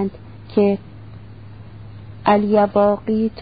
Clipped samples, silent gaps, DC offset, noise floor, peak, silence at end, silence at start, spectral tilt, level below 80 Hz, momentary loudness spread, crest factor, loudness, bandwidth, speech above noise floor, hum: under 0.1%; none; 0.5%; -38 dBFS; -2 dBFS; 0 s; 0 s; -12 dB/octave; -48 dBFS; 24 LU; 18 dB; -18 LUFS; 5 kHz; 22 dB; none